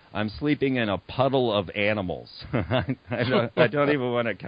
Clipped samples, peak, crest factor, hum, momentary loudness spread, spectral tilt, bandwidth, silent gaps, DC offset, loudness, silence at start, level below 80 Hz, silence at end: under 0.1%; -6 dBFS; 18 dB; none; 9 LU; -10 dB/octave; 5.2 kHz; none; under 0.1%; -25 LUFS; 0.15 s; -50 dBFS; 0 s